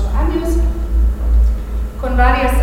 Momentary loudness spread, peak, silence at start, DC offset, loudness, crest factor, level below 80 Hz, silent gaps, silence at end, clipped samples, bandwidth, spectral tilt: 9 LU; 0 dBFS; 0 s; under 0.1%; -17 LUFS; 14 dB; -14 dBFS; none; 0 s; under 0.1%; 13 kHz; -7 dB/octave